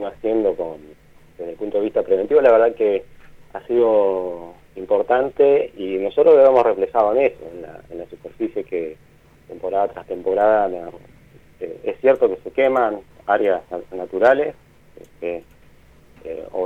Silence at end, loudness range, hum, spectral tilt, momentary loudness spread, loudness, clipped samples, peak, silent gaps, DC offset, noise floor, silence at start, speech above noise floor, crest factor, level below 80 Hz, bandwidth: 0 s; 7 LU; none; -7 dB/octave; 21 LU; -19 LUFS; under 0.1%; -2 dBFS; none; under 0.1%; -49 dBFS; 0 s; 30 dB; 18 dB; -54 dBFS; 5.2 kHz